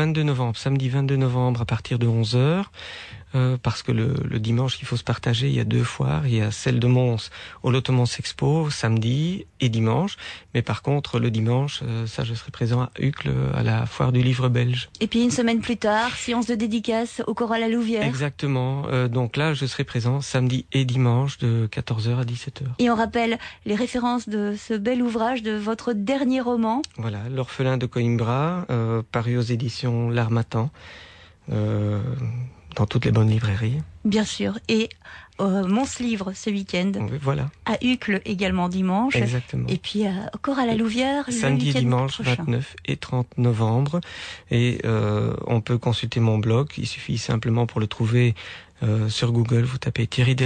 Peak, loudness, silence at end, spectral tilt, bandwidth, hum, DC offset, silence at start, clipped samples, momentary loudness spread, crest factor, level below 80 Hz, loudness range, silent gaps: -10 dBFS; -23 LUFS; 0 s; -6.5 dB/octave; 9.4 kHz; none; under 0.1%; 0 s; under 0.1%; 7 LU; 12 dB; -50 dBFS; 2 LU; none